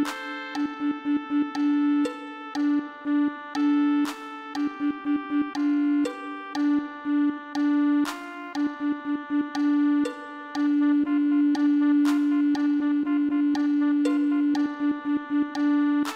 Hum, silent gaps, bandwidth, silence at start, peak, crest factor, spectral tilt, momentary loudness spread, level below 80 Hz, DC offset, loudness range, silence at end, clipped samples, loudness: none; none; 9.2 kHz; 0 s; -14 dBFS; 10 dB; -4.5 dB/octave; 8 LU; -72 dBFS; under 0.1%; 4 LU; 0 s; under 0.1%; -25 LUFS